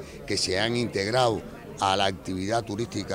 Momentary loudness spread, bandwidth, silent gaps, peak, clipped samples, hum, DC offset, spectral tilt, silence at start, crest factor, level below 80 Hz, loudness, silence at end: 8 LU; 16 kHz; none; -8 dBFS; under 0.1%; none; under 0.1%; -4 dB/octave; 0 s; 18 dB; -54 dBFS; -26 LUFS; 0 s